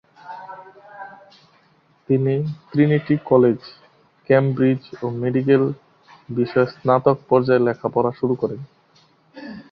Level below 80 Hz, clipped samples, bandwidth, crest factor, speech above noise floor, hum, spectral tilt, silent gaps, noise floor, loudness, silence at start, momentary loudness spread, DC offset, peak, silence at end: -60 dBFS; under 0.1%; 5.8 kHz; 18 dB; 40 dB; none; -10.5 dB/octave; none; -58 dBFS; -19 LUFS; 0.25 s; 22 LU; under 0.1%; -2 dBFS; 0.1 s